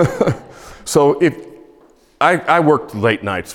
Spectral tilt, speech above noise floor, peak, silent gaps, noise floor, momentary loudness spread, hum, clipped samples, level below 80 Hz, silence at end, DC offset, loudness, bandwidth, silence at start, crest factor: -5.5 dB/octave; 34 dB; 0 dBFS; none; -49 dBFS; 11 LU; none; under 0.1%; -48 dBFS; 0 s; under 0.1%; -15 LUFS; 17 kHz; 0 s; 16 dB